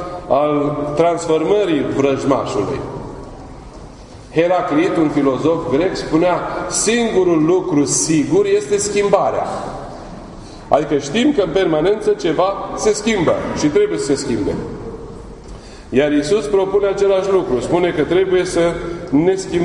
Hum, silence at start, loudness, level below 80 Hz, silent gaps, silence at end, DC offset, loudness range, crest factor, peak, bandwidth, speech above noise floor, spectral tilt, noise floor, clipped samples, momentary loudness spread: none; 0 s; -16 LUFS; -40 dBFS; none; 0 s; under 0.1%; 4 LU; 16 dB; 0 dBFS; 11 kHz; 20 dB; -5 dB/octave; -36 dBFS; under 0.1%; 17 LU